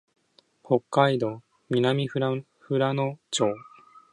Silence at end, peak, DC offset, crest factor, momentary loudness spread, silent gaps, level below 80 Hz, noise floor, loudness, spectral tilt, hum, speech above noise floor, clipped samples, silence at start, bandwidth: 0.5 s; -6 dBFS; under 0.1%; 22 dB; 9 LU; none; -72 dBFS; -62 dBFS; -26 LUFS; -5.5 dB/octave; none; 37 dB; under 0.1%; 0.7 s; 11 kHz